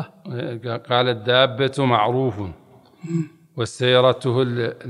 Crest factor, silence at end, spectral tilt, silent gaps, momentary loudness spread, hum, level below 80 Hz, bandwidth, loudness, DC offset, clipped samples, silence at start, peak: 20 dB; 0 s; -6 dB/octave; none; 15 LU; none; -60 dBFS; 11.5 kHz; -20 LUFS; under 0.1%; under 0.1%; 0 s; 0 dBFS